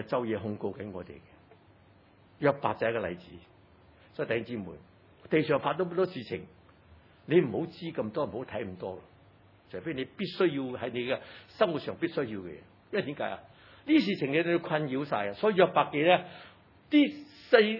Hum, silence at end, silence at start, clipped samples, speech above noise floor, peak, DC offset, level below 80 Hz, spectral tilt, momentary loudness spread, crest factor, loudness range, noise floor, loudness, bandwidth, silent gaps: none; 0 s; 0 s; under 0.1%; 30 dB; -8 dBFS; under 0.1%; -70 dBFS; -8.5 dB/octave; 18 LU; 24 dB; 7 LU; -60 dBFS; -30 LUFS; 5.8 kHz; none